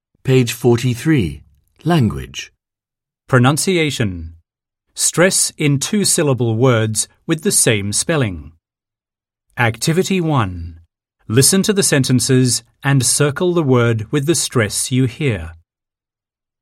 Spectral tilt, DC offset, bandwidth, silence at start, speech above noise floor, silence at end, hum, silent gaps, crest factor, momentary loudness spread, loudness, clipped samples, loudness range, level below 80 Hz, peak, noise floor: -4.5 dB/octave; under 0.1%; 16.5 kHz; 0.25 s; 72 dB; 1.05 s; none; none; 16 dB; 12 LU; -15 LUFS; under 0.1%; 4 LU; -44 dBFS; 0 dBFS; -88 dBFS